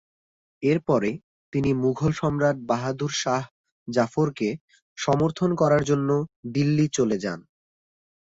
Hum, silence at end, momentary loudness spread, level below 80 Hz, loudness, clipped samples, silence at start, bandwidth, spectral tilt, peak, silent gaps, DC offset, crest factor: none; 0.95 s; 9 LU; -54 dBFS; -24 LUFS; under 0.1%; 0.6 s; 8 kHz; -6 dB/octave; -8 dBFS; 1.23-1.52 s, 3.51-3.64 s, 3.72-3.86 s, 4.61-4.68 s, 4.82-4.96 s, 6.36-6.43 s; under 0.1%; 16 dB